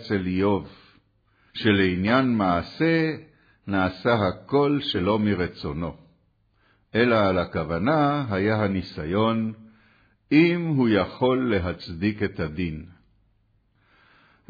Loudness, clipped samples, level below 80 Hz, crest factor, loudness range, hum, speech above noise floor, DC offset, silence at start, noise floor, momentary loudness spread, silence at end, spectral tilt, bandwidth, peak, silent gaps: -24 LUFS; under 0.1%; -50 dBFS; 18 dB; 2 LU; none; 42 dB; under 0.1%; 0 s; -65 dBFS; 11 LU; 1.6 s; -8.5 dB/octave; 5 kHz; -6 dBFS; none